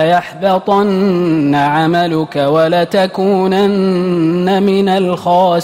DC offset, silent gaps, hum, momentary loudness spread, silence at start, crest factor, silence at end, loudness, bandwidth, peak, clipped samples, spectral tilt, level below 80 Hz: under 0.1%; none; none; 2 LU; 0 s; 10 dB; 0 s; -12 LUFS; 15.5 kHz; -2 dBFS; under 0.1%; -7 dB/octave; -52 dBFS